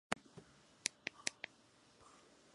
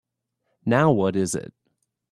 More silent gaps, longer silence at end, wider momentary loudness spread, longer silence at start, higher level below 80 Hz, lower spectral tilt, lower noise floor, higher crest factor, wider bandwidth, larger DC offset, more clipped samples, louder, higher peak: neither; second, 0.5 s vs 0.7 s; first, 22 LU vs 12 LU; second, 0.1 s vs 0.65 s; second, -80 dBFS vs -60 dBFS; second, -1 dB/octave vs -6 dB/octave; second, -68 dBFS vs -76 dBFS; first, 36 dB vs 20 dB; second, 11.5 kHz vs 13.5 kHz; neither; neither; second, -45 LUFS vs -22 LUFS; second, -14 dBFS vs -4 dBFS